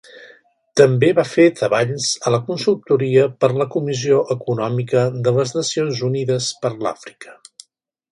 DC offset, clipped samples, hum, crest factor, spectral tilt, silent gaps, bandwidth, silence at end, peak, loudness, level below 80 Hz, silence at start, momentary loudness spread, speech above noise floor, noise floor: under 0.1%; under 0.1%; none; 18 dB; -5.5 dB/octave; none; 11.5 kHz; 0.8 s; 0 dBFS; -18 LUFS; -62 dBFS; 0.15 s; 8 LU; 37 dB; -54 dBFS